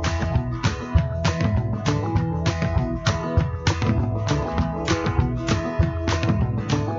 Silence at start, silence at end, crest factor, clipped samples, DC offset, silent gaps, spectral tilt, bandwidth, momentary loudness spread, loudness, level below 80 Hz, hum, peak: 0 s; 0 s; 16 dB; under 0.1%; under 0.1%; none; -6 dB/octave; 7.6 kHz; 2 LU; -23 LUFS; -30 dBFS; none; -6 dBFS